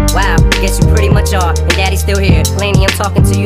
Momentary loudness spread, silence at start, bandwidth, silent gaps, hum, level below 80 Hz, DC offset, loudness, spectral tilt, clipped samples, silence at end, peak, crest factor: 2 LU; 0 s; 16 kHz; none; none; -14 dBFS; under 0.1%; -11 LUFS; -5 dB/octave; under 0.1%; 0 s; 0 dBFS; 10 dB